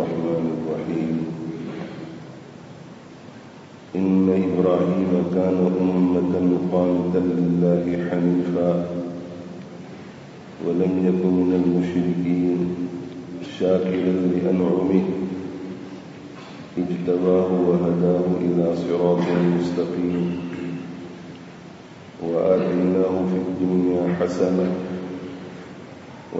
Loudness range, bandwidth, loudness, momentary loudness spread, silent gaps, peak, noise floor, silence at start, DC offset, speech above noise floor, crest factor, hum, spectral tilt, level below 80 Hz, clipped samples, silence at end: 5 LU; 7.8 kHz; -22 LUFS; 20 LU; none; -4 dBFS; -42 dBFS; 0 s; under 0.1%; 22 dB; 18 dB; none; -8.5 dB/octave; -60 dBFS; under 0.1%; 0 s